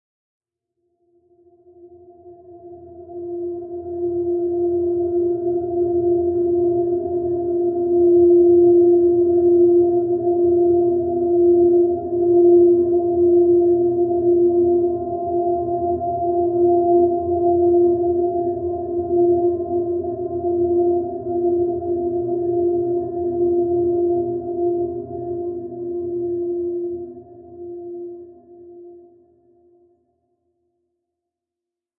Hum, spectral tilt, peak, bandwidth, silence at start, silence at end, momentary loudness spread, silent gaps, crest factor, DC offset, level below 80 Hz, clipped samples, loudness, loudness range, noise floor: none; -16.5 dB/octave; -6 dBFS; 1.1 kHz; 1.85 s; 3 s; 13 LU; none; 14 dB; under 0.1%; -54 dBFS; under 0.1%; -18 LUFS; 13 LU; -86 dBFS